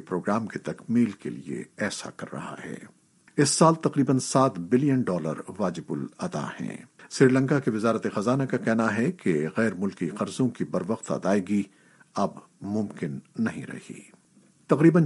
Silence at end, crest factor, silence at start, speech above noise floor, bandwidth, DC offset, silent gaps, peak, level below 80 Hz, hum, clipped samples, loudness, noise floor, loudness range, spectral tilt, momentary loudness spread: 0 s; 22 dB; 0 s; 34 dB; 11.5 kHz; under 0.1%; none; -4 dBFS; -70 dBFS; none; under 0.1%; -26 LUFS; -60 dBFS; 6 LU; -6 dB/octave; 16 LU